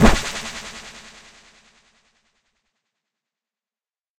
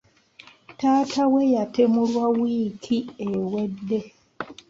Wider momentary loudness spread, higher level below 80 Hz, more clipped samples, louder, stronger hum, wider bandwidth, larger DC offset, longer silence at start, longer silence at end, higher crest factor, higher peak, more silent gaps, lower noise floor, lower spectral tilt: first, 25 LU vs 9 LU; first, -30 dBFS vs -64 dBFS; neither; about the same, -24 LUFS vs -23 LUFS; neither; first, 16 kHz vs 7.6 kHz; neither; second, 0 s vs 0.7 s; first, 3.2 s vs 0.15 s; first, 24 dB vs 16 dB; first, 0 dBFS vs -8 dBFS; neither; first, under -90 dBFS vs -51 dBFS; second, -4.5 dB/octave vs -6.5 dB/octave